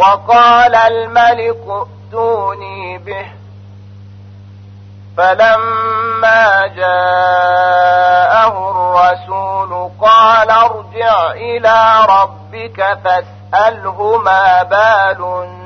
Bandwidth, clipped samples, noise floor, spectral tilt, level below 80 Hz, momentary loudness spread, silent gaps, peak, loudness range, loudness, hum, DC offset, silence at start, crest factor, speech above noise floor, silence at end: 6.6 kHz; under 0.1%; -34 dBFS; -4.5 dB/octave; -52 dBFS; 14 LU; none; 0 dBFS; 8 LU; -10 LUFS; none; under 0.1%; 0 s; 10 dB; 23 dB; 0 s